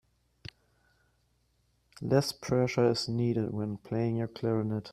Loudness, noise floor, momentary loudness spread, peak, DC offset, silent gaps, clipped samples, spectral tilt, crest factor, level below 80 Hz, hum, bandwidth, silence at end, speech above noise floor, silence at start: -30 LUFS; -72 dBFS; 21 LU; -12 dBFS; under 0.1%; none; under 0.1%; -6.5 dB/octave; 20 dB; -62 dBFS; none; 14.5 kHz; 0 s; 42 dB; 2 s